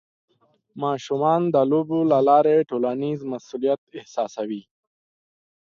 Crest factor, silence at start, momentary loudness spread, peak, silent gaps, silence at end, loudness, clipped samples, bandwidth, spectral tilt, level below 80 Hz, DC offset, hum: 18 dB; 0.75 s; 14 LU; -4 dBFS; 3.78-3.87 s; 1.15 s; -22 LUFS; under 0.1%; 7.4 kHz; -7.5 dB/octave; -72 dBFS; under 0.1%; none